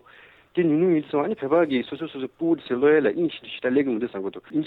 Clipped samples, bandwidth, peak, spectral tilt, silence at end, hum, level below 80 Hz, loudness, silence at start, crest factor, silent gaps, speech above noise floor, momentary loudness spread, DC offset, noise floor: under 0.1%; 4.5 kHz; -8 dBFS; -9.5 dB/octave; 0 s; none; -66 dBFS; -24 LUFS; 0.55 s; 14 dB; none; 29 dB; 11 LU; under 0.1%; -52 dBFS